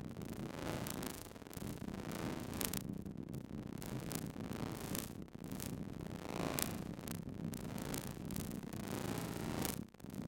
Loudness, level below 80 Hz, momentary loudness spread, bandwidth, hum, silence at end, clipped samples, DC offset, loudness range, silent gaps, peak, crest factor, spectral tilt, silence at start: -44 LUFS; -60 dBFS; 7 LU; 17 kHz; none; 0 s; under 0.1%; under 0.1%; 2 LU; none; -10 dBFS; 34 dB; -4.5 dB/octave; 0 s